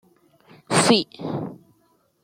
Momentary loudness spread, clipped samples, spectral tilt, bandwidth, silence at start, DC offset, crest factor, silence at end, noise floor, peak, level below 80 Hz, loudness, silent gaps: 14 LU; under 0.1%; -3.5 dB/octave; 15.5 kHz; 0.7 s; under 0.1%; 22 dB; 0.7 s; -64 dBFS; -4 dBFS; -64 dBFS; -21 LUFS; none